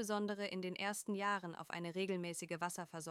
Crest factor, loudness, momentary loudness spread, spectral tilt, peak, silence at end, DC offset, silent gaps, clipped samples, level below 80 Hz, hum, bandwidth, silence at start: 16 dB; -42 LUFS; 5 LU; -4 dB/octave; -24 dBFS; 0 s; under 0.1%; none; under 0.1%; -88 dBFS; none; 16 kHz; 0 s